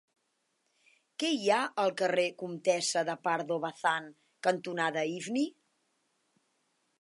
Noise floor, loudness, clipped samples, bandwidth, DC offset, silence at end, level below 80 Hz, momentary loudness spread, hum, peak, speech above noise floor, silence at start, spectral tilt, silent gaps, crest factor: -78 dBFS; -31 LUFS; under 0.1%; 11.5 kHz; under 0.1%; 1.5 s; -88 dBFS; 6 LU; none; -14 dBFS; 48 dB; 1.2 s; -3.5 dB/octave; none; 20 dB